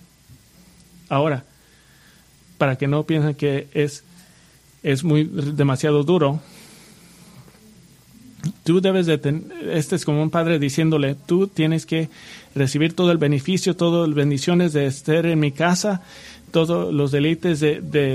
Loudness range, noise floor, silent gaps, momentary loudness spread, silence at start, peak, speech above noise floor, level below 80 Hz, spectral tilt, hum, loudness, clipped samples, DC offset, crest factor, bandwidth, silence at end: 5 LU; -52 dBFS; none; 8 LU; 1.1 s; -2 dBFS; 33 dB; -58 dBFS; -6.5 dB/octave; none; -20 LUFS; under 0.1%; under 0.1%; 20 dB; 14 kHz; 0 s